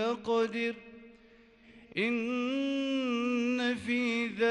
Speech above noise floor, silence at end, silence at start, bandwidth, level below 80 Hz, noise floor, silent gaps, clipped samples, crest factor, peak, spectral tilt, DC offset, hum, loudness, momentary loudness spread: 28 dB; 0 s; 0 s; 10.5 kHz; -70 dBFS; -59 dBFS; none; under 0.1%; 14 dB; -18 dBFS; -4.5 dB/octave; under 0.1%; none; -31 LUFS; 6 LU